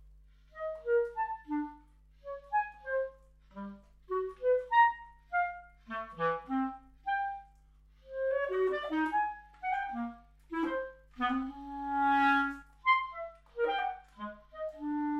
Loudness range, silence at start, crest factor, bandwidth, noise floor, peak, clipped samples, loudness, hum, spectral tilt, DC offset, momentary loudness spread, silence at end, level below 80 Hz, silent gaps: 5 LU; 0 s; 20 dB; 8.4 kHz; -61 dBFS; -14 dBFS; under 0.1%; -33 LUFS; 50 Hz at -60 dBFS; -6 dB/octave; under 0.1%; 17 LU; 0 s; -60 dBFS; none